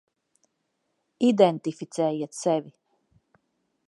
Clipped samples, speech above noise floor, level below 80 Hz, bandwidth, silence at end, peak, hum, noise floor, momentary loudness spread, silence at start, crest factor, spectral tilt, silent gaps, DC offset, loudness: under 0.1%; 53 dB; -80 dBFS; 11.5 kHz; 1.2 s; -4 dBFS; none; -77 dBFS; 11 LU; 1.2 s; 24 dB; -6 dB/octave; none; under 0.1%; -25 LUFS